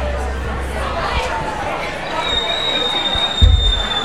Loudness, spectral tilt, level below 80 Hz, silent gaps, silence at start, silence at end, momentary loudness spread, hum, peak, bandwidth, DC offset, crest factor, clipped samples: -18 LUFS; -4 dB/octave; -22 dBFS; none; 0 s; 0 s; 9 LU; none; 0 dBFS; 12.5 kHz; 2%; 18 dB; under 0.1%